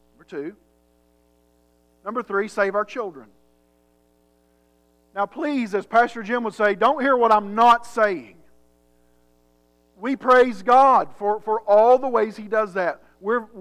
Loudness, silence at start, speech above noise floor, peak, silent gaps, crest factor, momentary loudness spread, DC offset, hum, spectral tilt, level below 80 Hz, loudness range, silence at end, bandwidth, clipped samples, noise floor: -20 LUFS; 0.3 s; 42 dB; -6 dBFS; none; 16 dB; 16 LU; under 0.1%; 60 Hz at -65 dBFS; -5 dB/octave; -64 dBFS; 10 LU; 0 s; 12 kHz; under 0.1%; -62 dBFS